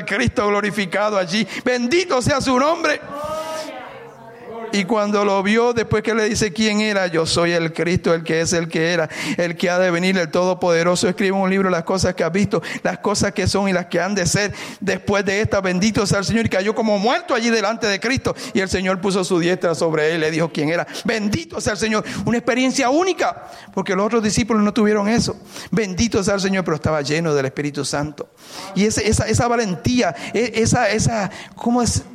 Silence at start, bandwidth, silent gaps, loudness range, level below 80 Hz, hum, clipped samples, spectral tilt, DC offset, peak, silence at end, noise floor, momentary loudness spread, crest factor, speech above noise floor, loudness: 0 s; 15 kHz; none; 2 LU; -44 dBFS; none; under 0.1%; -4.5 dB/octave; under 0.1%; -6 dBFS; 0 s; -38 dBFS; 7 LU; 12 dB; 20 dB; -19 LUFS